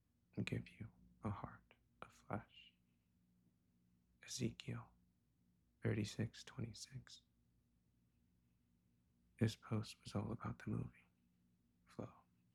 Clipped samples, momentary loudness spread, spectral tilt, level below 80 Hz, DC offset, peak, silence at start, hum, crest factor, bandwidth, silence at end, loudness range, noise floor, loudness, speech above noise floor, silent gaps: under 0.1%; 19 LU; -6 dB/octave; -72 dBFS; under 0.1%; -26 dBFS; 0.35 s; 60 Hz at -75 dBFS; 24 dB; 13.5 kHz; 0.35 s; 7 LU; -80 dBFS; -48 LUFS; 34 dB; none